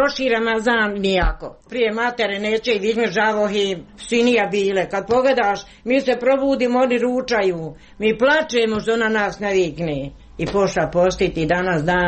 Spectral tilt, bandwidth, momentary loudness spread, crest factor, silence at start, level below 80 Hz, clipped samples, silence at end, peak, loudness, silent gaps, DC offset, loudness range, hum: -5 dB/octave; 8.8 kHz; 7 LU; 12 dB; 0 s; -36 dBFS; under 0.1%; 0 s; -6 dBFS; -19 LUFS; none; under 0.1%; 2 LU; none